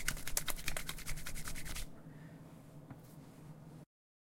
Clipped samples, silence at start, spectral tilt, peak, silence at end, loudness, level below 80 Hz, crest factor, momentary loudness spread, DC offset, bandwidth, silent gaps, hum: under 0.1%; 0 s; -2 dB/octave; -10 dBFS; 0.4 s; -44 LUFS; -48 dBFS; 32 dB; 18 LU; under 0.1%; 17 kHz; none; none